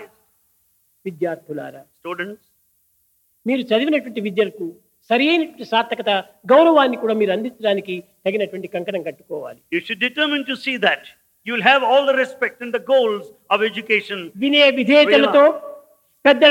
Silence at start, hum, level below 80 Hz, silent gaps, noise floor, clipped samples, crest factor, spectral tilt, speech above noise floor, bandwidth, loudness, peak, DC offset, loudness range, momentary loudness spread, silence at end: 0 s; none; -76 dBFS; none; -63 dBFS; under 0.1%; 18 dB; -5 dB/octave; 45 dB; 16 kHz; -18 LUFS; 0 dBFS; under 0.1%; 9 LU; 18 LU; 0 s